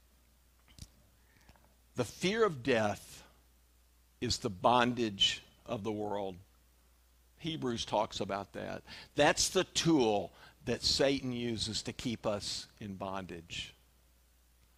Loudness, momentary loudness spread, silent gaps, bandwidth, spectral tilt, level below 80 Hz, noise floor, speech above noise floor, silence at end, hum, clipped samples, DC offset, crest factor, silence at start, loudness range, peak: -33 LUFS; 15 LU; none; 15.5 kHz; -3.5 dB/octave; -60 dBFS; -67 dBFS; 33 dB; 1.05 s; none; under 0.1%; under 0.1%; 22 dB; 0.8 s; 7 LU; -12 dBFS